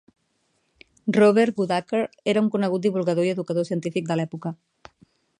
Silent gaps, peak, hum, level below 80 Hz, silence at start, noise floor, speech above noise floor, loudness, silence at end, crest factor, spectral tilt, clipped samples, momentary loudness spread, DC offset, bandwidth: none; -6 dBFS; none; -70 dBFS; 1.05 s; -70 dBFS; 48 dB; -23 LUFS; 0.85 s; 18 dB; -7 dB/octave; under 0.1%; 13 LU; under 0.1%; 11 kHz